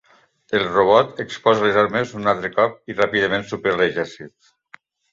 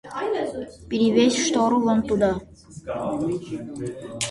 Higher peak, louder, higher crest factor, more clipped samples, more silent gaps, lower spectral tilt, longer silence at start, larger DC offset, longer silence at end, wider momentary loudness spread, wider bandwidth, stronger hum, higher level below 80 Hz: first, -2 dBFS vs -6 dBFS; first, -19 LUFS vs -23 LUFS; about the same, 18 dB vs 18 dB; neither; neither; about the same, -5.5 dB/octave vs -4.5 dB/octave; first, 0.5 s vs 0.05 s; neither; first, 0.85 s vs 0 s; second, 9 LU vs 14 LU; second, 7.6 kHz vs 11.5 kHz; neither; second, -56 dBFS vs -50 dBFS